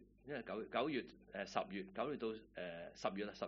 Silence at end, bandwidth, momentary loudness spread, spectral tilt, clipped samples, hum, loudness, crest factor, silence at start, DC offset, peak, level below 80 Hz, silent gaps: 0 s; 6.6 kHz; 9 LU; -3.5 dB/octave; under 0.1%; none; -45 LUFS; 24 dB; 0 s; under 0.1%; -22 dBFS; -72 dBFS; none